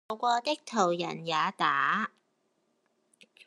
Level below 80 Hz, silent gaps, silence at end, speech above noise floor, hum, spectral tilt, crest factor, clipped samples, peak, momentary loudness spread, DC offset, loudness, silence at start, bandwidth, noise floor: -86 dBFS; none; 1.4 s; 46 dB; none; -3.5 dB/octave; 20 dB; under 0.1%; -12 dBFS; 5 LU; under 0.1%; -29 LUFS; 0.1 s; 12 kHz; -75 dBFS